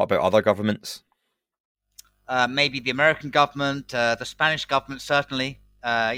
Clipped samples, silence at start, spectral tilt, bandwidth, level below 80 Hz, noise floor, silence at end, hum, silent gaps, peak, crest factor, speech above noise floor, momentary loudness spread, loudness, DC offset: under 0.1%; 0 s; -4 dB/octave; 16.5 kHz; -58 dBFS; -74 dBFS; 0 s; none; 1.60-1.75 s; -4 dBFS; 20 dB; 51 dB; 9 LU; -23 LUFS; under 0.1%